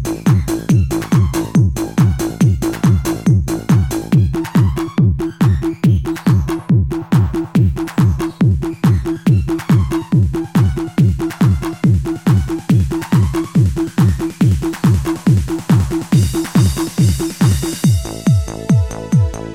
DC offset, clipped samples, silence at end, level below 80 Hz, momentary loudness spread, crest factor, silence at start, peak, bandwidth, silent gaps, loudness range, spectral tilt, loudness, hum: 0.2%; under 0.1%; 0 s; -26 dBFS; 1 LU; 12 dB; 0 s; -2 dBFS; 16.5 kHz; none; 0 LU; -7 dB/octave; -15 LUFS; none